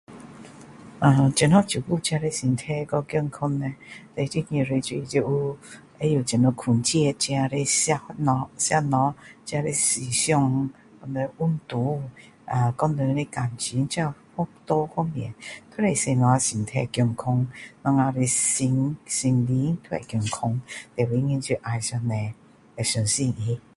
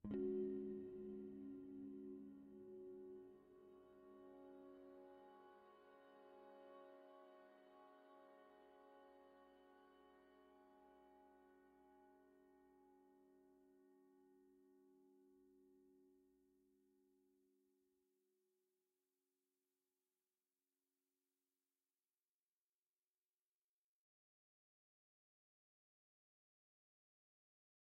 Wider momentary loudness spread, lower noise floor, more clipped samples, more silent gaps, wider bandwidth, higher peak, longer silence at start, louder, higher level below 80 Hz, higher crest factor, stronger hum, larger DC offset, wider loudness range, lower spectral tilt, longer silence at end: second, 11 LU vs 18 LU; second, -45 dBFS vs under -90 dBFS; neither; neither; first, 11.5 kHz vs 4.6 kHz; first, -4 dBFS vs -36 dBFS; about the same, 0.1 s vs 0 s; first, -24 LUFS vs -55 LUFS; first, -56 dBFS vs -86 dBFS; about the same, 20 dB vs 24 dB; neither; neither; second, 4 LU vs 14 LU; second, -5 dB/octave vs -8 dB/octave; second, 0.15 s vs 10.45 s